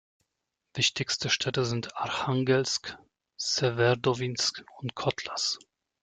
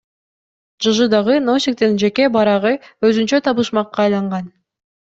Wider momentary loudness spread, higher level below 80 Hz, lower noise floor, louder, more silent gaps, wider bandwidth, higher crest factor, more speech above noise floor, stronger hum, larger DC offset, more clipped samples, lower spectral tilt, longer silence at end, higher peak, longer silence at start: first, 9 LU vs 6 LU; second, -64 dBFS vs -58 dBFS; second, -84 dBFS vs under -90 dBFS; second, -28 LUFS vs -16 LUFS; neither; first, 9.4 kHz vs 8 kHz; about the same, 18 dB vs 14 dB; second, 55 dB vs over 75 dB; neither; neither; neither; second, -3.5 dB/octave vs -5 dB/octave; about the same, 0.45 s vs 0.55 s; second, -12 dBFS vs -2 dBFS; about the same, 0.75 s vs 0.8 s